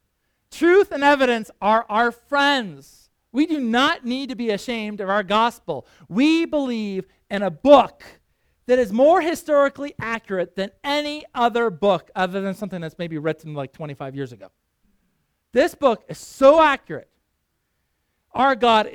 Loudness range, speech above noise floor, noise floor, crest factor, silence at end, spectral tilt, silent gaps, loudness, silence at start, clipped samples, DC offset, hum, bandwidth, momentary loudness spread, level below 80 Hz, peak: 7 LU; 53 dB; -73 dBFS; 20 dB; 0 s; -5 dB/octave; none; -20 LUFS; 0.5 s; under 0.1%; under 0.1%; none; 16 kHz; 16 LU; -56 dBFS; 0 dBFS